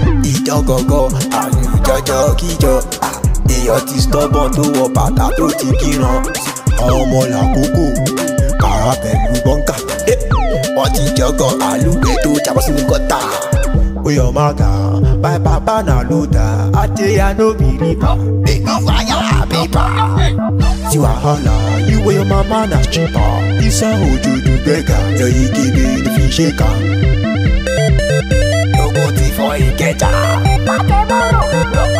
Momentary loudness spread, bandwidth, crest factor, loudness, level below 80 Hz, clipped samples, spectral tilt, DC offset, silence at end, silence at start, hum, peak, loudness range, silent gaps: 2 LU; 16 kHz; 12 dB; -13 LUFS; -18 dBFS; under 0.1%; -5.5 dB/octave; under 0.1%; 0 s; 0 s; none; 0 dBFS; 1 LU; none